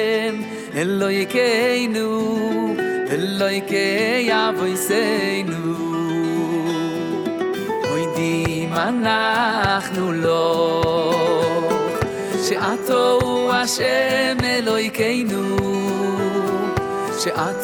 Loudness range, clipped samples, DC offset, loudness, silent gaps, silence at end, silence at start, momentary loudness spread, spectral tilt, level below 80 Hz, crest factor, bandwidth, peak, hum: 3 LU; under 0.1%; under 0.1%; -20 LUFS; none; 0 s; 0 s; 6 LU; -4.5 dB/octave; -50 dBFS; 14 dB; 19.5 kHz; -4 dBFS; none